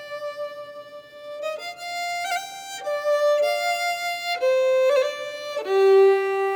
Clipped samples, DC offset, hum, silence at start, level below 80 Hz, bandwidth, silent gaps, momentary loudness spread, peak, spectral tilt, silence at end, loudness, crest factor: under 0.1%; under 0.1%; none; 0 s; -78 dBFS; 19.5 kHz; none; 17 LU; -8 dBFS; -1.5 dB/octave; 0 s; -22 LUFS; 14 dB